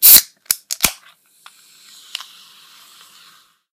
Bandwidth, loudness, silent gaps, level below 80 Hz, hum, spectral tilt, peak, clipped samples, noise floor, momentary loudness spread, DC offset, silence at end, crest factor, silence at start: over 20 kHz; -13 LUFS; none; -50 dBFS; none; 1.5 dB/octave; 0 dBFS; 0.4%; -51 dBFS; 24 LU; under 0.1%; 2.8 s; 18 dB; 0 s